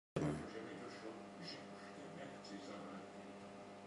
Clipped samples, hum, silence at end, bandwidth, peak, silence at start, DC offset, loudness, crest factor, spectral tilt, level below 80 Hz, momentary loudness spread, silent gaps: under 0.1%; 50 Hz at -60 dBFS; 0 s; 11.5 kHz; -26 dBFS; 0.15 s; under 0.1%; -50 LUFS; 24 dB; -6 dB/octave; -70 dBFS; 11 LU; none